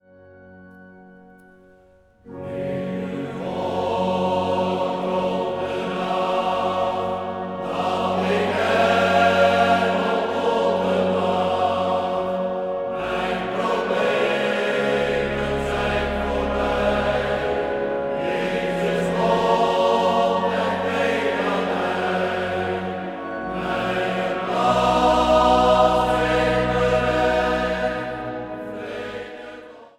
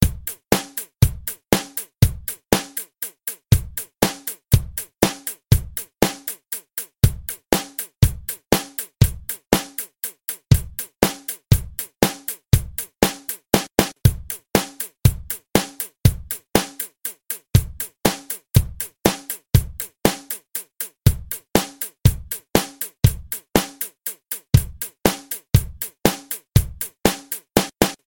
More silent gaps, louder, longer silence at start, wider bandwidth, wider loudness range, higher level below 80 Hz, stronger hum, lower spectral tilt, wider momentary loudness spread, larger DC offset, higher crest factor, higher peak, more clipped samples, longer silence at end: neither; about the same, -21 LUFS vs -22 LUFS; first, 0.3 s vs 0 s; second, 15 kHz vs 17 kHz; first, 5 LU vs 1 LU; second, -42 dBFS vs -32 dBFS; neither; about the same, -5.5 dB/octave vs -5 dB/octave; about the same, 11 LU vs 10 LU; second, under 0.1% vs 0.1%; about the same, 18 dB vs 22 dB; second, -4 dBFS vs 0 dBFS; neither; about the same, 0.1 s vs 0.15 s